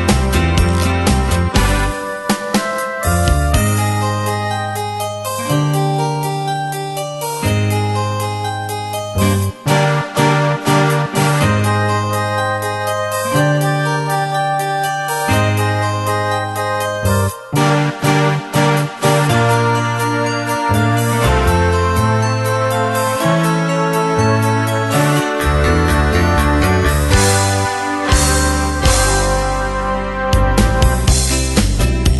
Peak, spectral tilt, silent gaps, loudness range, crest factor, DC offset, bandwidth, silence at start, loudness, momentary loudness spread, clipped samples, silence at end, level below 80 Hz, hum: 0 dBFS; -5 dB/octave; none; 4 LU; 14 dB; under 0.1%; 12.5 kHz; 0 s; -15 LUFS; 6 LU; under 0.1%; 0 s; -22 dBFS; none